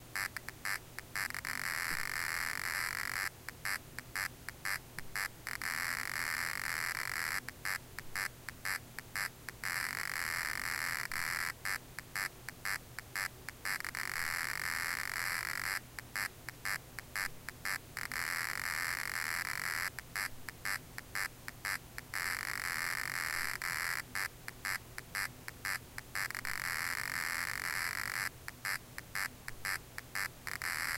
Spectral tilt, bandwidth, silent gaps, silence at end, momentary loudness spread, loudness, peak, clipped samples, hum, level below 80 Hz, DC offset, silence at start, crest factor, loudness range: -1 dB/octave; 17 kHz; none; 0 s; 6 LU; -38 LUFS; -18 dBFS; under 0.1%; none; -60 dBFS; under 0.1%; 0 s; 22 dB; 2 LU